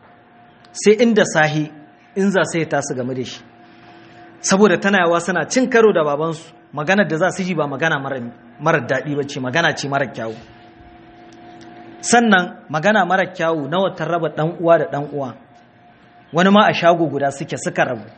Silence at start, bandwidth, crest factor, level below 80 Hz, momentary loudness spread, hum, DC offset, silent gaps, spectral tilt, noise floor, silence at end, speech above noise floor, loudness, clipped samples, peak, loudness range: 0.75 s; 8.8 kHz; 18 dB; -62 dBFS; 14 LU; none; under 0.1%; none; -4.5 dB/octave; -48 dBFS; 0.05 s; 31 dB; -17 LUFS; under 0.1%; 0 dBFS; 5 LU